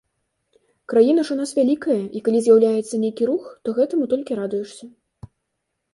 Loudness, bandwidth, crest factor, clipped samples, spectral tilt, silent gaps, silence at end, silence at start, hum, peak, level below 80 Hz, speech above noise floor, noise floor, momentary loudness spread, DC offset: -20 LUFS; 11.5 kHz; 18 dB; under 0.1%; -6 dB/octave; none; 1.05 s; 0.9 s; none; -4 dBFS; -64 dBFS; 58 dB; -77 dBFS; 10 LU; under 0.1%